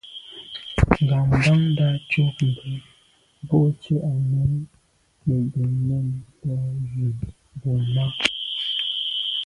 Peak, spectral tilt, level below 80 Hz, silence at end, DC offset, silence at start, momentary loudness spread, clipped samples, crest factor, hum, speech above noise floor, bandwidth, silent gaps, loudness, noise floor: 0 dBFS; -6.5 dB/octave; -38 dBFS; 0 s; under 0.1%; 0.05 s; 15 LU; under 0.1%; 22 dB; none; 37 dB; 11 kHz; none; -23 LUFS; -59 dBFS